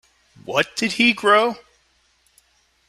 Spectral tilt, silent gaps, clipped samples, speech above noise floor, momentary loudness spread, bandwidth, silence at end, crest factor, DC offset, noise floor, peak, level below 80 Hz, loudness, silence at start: -3 dB/octave; none; under 0.1%; 44 dB; 9 LU; 15 kHz; 1.3 s; 20 dB; under 0.1%; -62 dBFS; -2 dBFS; -62 dBFS; -18 LUFS; 0.45 s